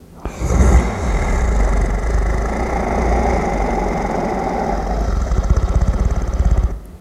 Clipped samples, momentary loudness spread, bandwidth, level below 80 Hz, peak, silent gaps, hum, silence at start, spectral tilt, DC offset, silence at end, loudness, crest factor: under 0.1%; 4 LU; 11 kHz; -18 dBFS; 0 dBFS; none; none; 0.1 s; -7 dB/octave; under 0.1%; 0 s; -19 LUFS; 16 dB